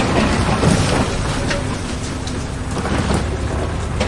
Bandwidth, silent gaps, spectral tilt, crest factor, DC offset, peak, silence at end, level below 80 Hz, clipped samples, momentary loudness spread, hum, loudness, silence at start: 11.5 kHz; none; -5 dB/octave; 16 dB; under 0.1%; -2 dBFS; 0 s; -26 dBFS; under 0.1%; 9 LU; none; -19 LUFS; 0 s